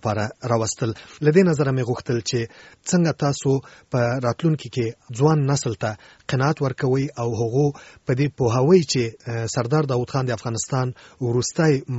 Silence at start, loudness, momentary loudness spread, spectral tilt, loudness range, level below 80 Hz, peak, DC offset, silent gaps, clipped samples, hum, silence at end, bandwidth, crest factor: 0.05 s; -22 LUFS; 10 LU; -6 dB/octave; 2 LU; -54 dBFS; -4 dBFS; under 0.1%; none; under 0.1%; none; 0 s; 8.2 kHz; 18 dB